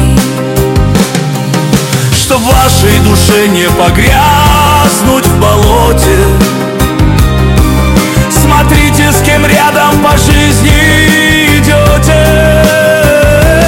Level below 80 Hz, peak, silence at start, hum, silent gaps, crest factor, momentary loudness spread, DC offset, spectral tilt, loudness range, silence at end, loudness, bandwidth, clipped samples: -14 dBFS; 0 dBFS; 0 s; none; none; 6 dB; 4 LU; under 0.1%; -4.5 dB/octave; 2 LU; 0 s; -6 LUFS; 17 kHz; 1%